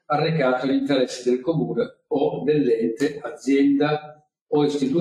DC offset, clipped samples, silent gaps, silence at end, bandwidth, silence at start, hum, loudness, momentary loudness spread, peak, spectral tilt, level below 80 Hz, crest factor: under 0.1%; under 0.1%; 4.41-4.46 s; 0 s; 10.5 kHz; 0.1 s; none; -22 LUFS; 7 LU; -8 dBFS; -6.5 dB/octave; -66 dBFS; 14 dB